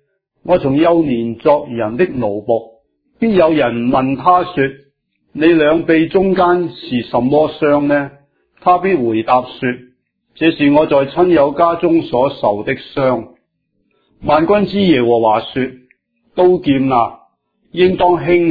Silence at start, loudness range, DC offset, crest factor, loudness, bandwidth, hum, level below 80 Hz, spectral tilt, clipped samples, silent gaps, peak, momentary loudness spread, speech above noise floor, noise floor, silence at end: 0.45 s; 2 LU; under 0.1%; 14 dB; -14 LUFS; 5 kHz; none; -46 dBFS; -10 dB/octave; under 0.1%; none; 0 dBFS; 9 LU; 53 dB; -65 dBFS; 0 s